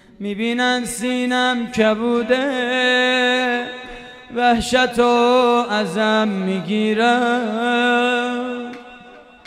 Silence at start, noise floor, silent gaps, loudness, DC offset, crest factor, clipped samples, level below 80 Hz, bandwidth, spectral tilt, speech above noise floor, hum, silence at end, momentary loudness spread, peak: 0.2 s; -43 dBFS; none; -18 LUFS; under 0.1%; 16 dB; under 0.1%; -50 dBFS; 14.5 kHz; -4 dB/octave; 25 dB; none; 0.25 s; 12 LU; -2 dBFS